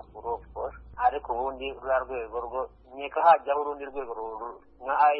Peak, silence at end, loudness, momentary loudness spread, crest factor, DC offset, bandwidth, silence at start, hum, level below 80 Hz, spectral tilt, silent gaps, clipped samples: -8 dBFS; 0 s; -29 LUFS; 16 LU; 20 dB; under 0.1%; 5.4 kHz; 0.1 s; none; -52 dBFS; -8 dB/octave; none; under 0.1%